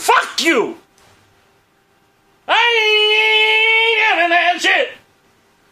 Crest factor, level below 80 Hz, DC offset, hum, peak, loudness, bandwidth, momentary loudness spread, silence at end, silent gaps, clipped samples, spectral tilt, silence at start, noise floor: 16 dB; -68 dBFS; under 0.1%; none; 0 dBFS; -12 LUFS; 15.5 kHz; 6 LU; 0.75 s; none; under 0.1%; 0 dB/octave; 0 s; -57 dBFS